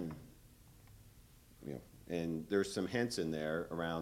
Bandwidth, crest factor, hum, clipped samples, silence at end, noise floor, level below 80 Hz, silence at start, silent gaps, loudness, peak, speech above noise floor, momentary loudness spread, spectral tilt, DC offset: 16.5 kHz; 20 dB; none; under 0.1%; 0 s; -62 dBFS; -64 dBFS; 0 s; none; -39 LUFS; -20 dBFS; 24 dB; 17 LU; -5.5 dB/octave; under 0.1%